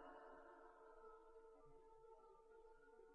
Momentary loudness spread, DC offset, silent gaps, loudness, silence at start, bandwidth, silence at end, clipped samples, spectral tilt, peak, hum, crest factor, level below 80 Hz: 6 LU; under 0.1%; none; -66 LUFS; 0 s; 5.2 kHz; 0 s; under 0.1%; -3.5 dB/octave; -48 dBFS; none; 16 dB; -76 dBFS